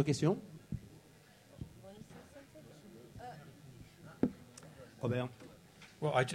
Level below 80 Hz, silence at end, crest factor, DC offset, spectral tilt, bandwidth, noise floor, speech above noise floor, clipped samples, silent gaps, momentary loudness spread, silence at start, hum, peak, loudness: -64 dBFS; 0 s; 24 dB; under 0.1%; -6 dB/octave; 16 kHz; -62 dBFS; 28 dB; under 0.1%; none; 22 LU; 0 s; none; -16 dBFS; -39 LUFS